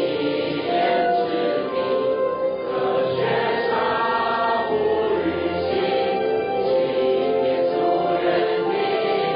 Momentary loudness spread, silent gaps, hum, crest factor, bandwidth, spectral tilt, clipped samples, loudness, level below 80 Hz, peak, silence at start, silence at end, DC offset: 3 LU; none; none; 12 dB; 5.2 kHz; -10 dB/octave; under 0.1%; -21 LUFS; -54 dBFS; -10 dBFS; 0 s; 0 s; under 0.1%